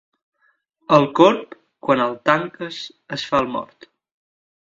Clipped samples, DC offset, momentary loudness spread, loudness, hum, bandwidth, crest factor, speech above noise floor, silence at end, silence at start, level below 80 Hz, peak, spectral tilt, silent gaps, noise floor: under 0.1%; under 0.1%; 15 LU; -19 LUFS; none; 7.8 kHz; 22 dB; 46 dB; 1.15 s; 0.9 s; -60 dBFS; 0 dBFS; -6 dB/octave; none; -65 dBFS